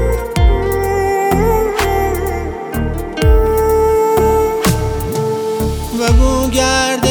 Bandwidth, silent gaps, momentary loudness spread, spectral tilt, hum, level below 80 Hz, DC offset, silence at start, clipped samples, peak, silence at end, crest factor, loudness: over 20 kHz; none; 7 LU; -5 dB/octave; none; -18 dBFS; under 0.1%; 0 s; under 0.1%; 0 dBFS; 0 s; 14 dB; -15 LUFS